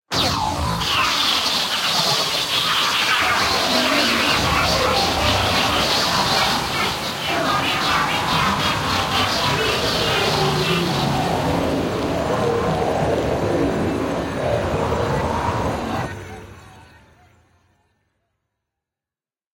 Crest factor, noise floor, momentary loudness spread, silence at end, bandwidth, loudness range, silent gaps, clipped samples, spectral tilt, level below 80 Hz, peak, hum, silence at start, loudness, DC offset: 16 dB; under -90 dBFS; 6 LU; 2.75 s; 16.5 kHz; 8 LU; none; under 0.1%; -3.5 dB/octave; -40 dBFS; -4 dBFS; none; 0.1 s; -19 LUFS; under 0.1%